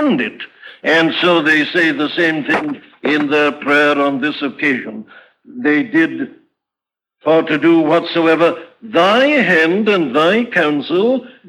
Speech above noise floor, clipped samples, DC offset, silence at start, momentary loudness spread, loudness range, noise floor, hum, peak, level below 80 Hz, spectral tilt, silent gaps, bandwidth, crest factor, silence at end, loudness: 72 dB; under 0.1%; under 0.1%; 0 s; 11 LU; 5 LU; -86 dBFS; none; -2 dBFS; -66 dBFS; -5.5 dB/octave; none; 11 kHz; 14 dB; 0.15 s; -14 LUFS